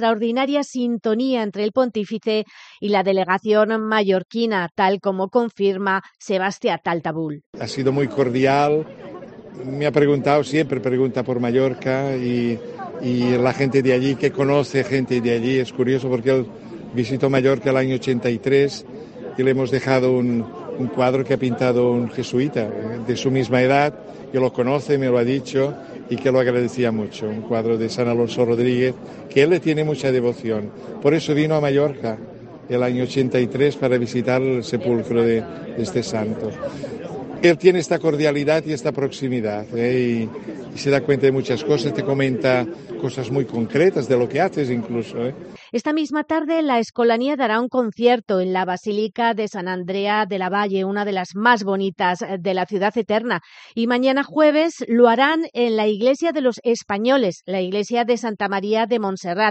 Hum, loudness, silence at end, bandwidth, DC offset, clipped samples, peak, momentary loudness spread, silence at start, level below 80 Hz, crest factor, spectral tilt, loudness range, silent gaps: none; -20 LUFS; 0 s; 8.8 kHz; under 0.1%; under 0.1%; 0 dBFS; 9 LU; 0 s; -58 dBFS; 20 dB; -6.5 dB/octave; 2 LU; 7.46-7.53 s